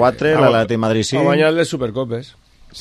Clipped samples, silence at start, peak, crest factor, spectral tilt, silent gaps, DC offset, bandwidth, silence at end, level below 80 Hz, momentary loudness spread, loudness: under 0.1%; 0 s; 0 dBFS; 16 dB; -5.5 dB/octave; none; under 0.1%; 13 kHz; 0 s; -48 dBFS; 10 LU; -16 LUFS